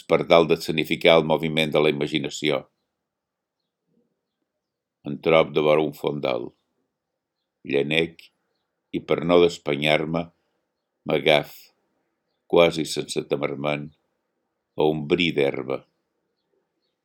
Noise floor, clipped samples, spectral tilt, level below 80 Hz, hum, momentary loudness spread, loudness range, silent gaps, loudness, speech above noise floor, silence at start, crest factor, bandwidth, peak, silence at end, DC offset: -83 dBFS; under 0.1%; -5 dB/octave; -60 dBFS; none; 13 LU; 5 LU; none; -22 LUFS; 62 dB; 0.1 s; 24 dB; 18.5 kHz; 0 dBFS; 1.25 s; under 0.1%